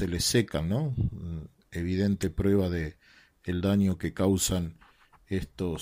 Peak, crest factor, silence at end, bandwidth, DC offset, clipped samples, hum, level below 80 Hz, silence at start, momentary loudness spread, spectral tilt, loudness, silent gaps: -12 dBFS; 16 dB; 0 s; 16 kHz; under 0.1%; under 0.1%; none; -44 dBFS; 0 s; 14 LU; -5.5 dB/octave; -29 LUFS; none